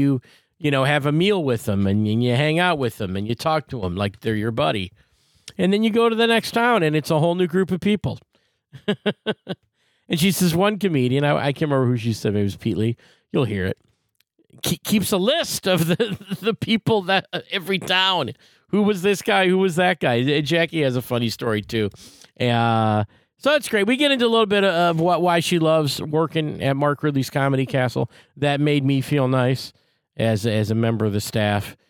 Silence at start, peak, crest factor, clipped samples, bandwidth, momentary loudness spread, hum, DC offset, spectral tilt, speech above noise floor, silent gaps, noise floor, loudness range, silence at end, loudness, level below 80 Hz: 0 s; -4 dBFS; 16 dB; under 0.1%; 18.5 kHz; 8 LU; none; under 0.1%; -5.5 dB/octave; 47 dB; none; -67 dBFS; 4 LU; 0.15 s; -21 LUFS; -58 dBFS